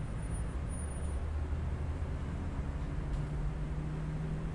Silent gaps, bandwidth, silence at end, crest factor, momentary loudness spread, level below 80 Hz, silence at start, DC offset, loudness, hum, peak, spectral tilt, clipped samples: none; 10.5 kHz; 0 s; 12 dB; 2 LU; -40 dBFS; 0 s; under 0.1%; -39 LUFS; none; -24 dBFS; -7 dB/octave; under 0.1%